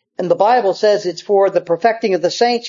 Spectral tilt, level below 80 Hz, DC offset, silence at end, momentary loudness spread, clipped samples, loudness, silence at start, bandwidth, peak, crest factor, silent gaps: -4.5 dB/octave; -70 dBFS; under 0.1%; 0 s; 4 LU; under 0.1%; -15 LUFS; 0.2 s; 7.6 kHz; 0 dBFS; 14 dB; none